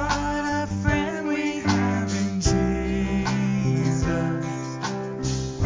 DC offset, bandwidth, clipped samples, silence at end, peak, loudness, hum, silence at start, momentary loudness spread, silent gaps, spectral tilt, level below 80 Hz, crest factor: under 0.1%; 7.6 kHz; under 0.1%; 0 s; -6 dBFS; -25 LUFS; none; 0 s; 6 LU; none; -5.5 dB/octave; -36 dBFS; 16 dB